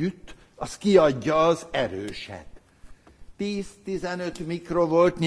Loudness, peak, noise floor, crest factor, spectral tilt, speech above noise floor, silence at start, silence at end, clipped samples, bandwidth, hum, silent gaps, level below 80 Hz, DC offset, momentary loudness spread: -24 LUFS; -4 dBFS; -48 dBFS; 20 dB; -6 dB/octave; 24 dB; 0 s; 0 s; under 0.1%; 11 kHz; none; none; -52 dBFS; under 0.1%; 17 LU